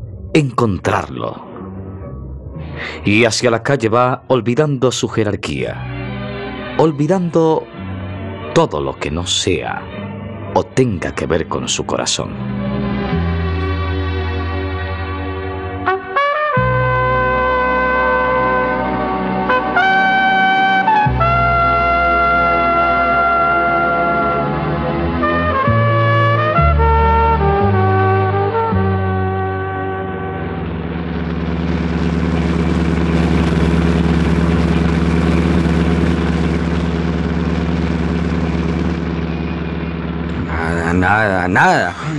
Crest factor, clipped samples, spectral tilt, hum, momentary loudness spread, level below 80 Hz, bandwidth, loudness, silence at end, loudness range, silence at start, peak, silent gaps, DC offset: 14 dB; under 0.1%; -6 dB/octave; none; 10 LU; -28 dBFS; 11.5 kHz; -16 LUFS; 0 s; 6 LU; 0 s; 0 dBFS; none; under 0.1%